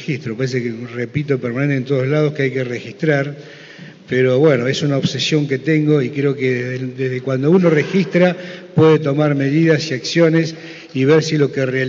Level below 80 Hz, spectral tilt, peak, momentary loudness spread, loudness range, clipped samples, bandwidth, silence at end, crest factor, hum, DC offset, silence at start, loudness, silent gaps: -60 dBFS; -6 dB/octave; 0 dBFS; 11 LU; 4 LU; under 0.1%; 7.6 kHz; 0 s; 16 dB; none; under 0.1%; 0 s; -17 LUFS; none